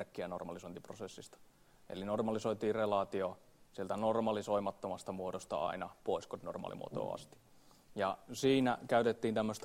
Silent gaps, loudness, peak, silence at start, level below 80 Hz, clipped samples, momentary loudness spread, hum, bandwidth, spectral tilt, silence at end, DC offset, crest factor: none; -37 LUFS; -18 dBFS; 0 s; -70 dBFS; under 0.1%; 16 LU; none; 16 kHz; -5.5 dB/octave; 0 s; under 0.1%; 20 dB